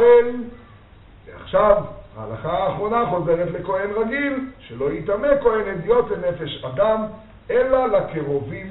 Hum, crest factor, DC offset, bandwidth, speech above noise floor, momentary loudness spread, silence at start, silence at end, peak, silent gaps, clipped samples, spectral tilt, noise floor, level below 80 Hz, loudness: none; 20 dB; under 0.1%; 4.1 kHz; 26 dB; 14 LU; 0 s; 0 s; 0 dBFS; none; under 0.1%; -5 dB/octave; -46 dBFS; -44 dBFS; -21 LUFS